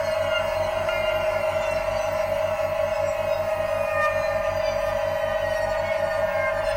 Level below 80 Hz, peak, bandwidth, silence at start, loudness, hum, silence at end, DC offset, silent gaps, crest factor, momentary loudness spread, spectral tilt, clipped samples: -44 dBFS; -10 dBFS; 16.5 kHz; 0 s; -24 LUFS; none; 0 s; under 0.1%; none; 14 dB; 2 LU; -4 dB/octave; under 0.1%